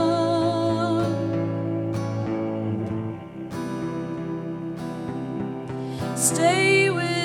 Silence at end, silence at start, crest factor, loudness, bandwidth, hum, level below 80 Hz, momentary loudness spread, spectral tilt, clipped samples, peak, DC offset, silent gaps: 0 s; 0 s; 18 dB; -25 LUFS; 16 kHz; none; -58 dBFS; 13 LU; -4.5 dB/octave; under 0.1%; -8 dBFS; under 0.1%; none